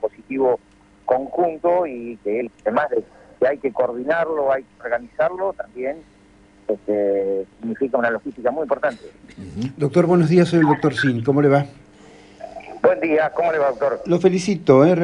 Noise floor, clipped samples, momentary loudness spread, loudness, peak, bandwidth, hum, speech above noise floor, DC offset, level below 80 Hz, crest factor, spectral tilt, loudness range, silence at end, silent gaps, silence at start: -51 dBFS; under 0.1%; 13 LU; -20 LUFS; -2 dBFS; 11 kHz; none; 31 dB; under 0.1%; -56 dBFS; 18 dB; -7.5 dB/octave; 5 LU; 0 s; none; 0 s